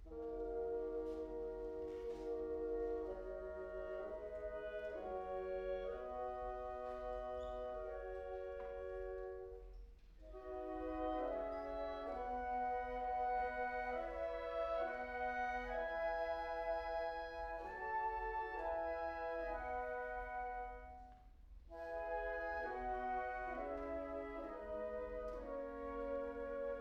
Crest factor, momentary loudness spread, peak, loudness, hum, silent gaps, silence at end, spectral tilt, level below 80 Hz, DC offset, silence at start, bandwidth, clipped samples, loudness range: 14 dB; 7 LU; -30 dBFS; -44 LUFS; none; none; 0 s; -6.5 dB/octave; -58 dBFS; under 0.1%; 0 s; 8 kHz; under 0.1%; 5 LU